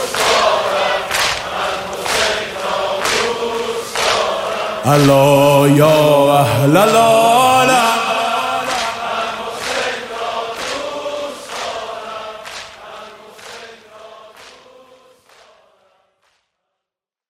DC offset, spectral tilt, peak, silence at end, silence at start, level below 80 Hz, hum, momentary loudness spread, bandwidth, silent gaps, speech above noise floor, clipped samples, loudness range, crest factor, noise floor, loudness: under 0.1%; -4 dB/octave; 0 dBFS; 2.8 s; 0 s; -50 dBFS; none; 18 LU; 16 kHz; none; 75 dB; under 0.1%; 18 LU; 16 dB; -85 dBFS; -14 LUFS